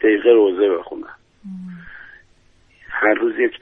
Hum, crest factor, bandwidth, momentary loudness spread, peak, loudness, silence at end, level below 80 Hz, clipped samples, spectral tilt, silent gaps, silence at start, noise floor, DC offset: none; 18 dB; 3.8 kHz; 24 LU; -2 dBFS; -17 LUFS; 0.05 s; -56 dBFS; under 0.1%; -8 dB/octave; none; 0 s; -54 dBFS; under 0.1%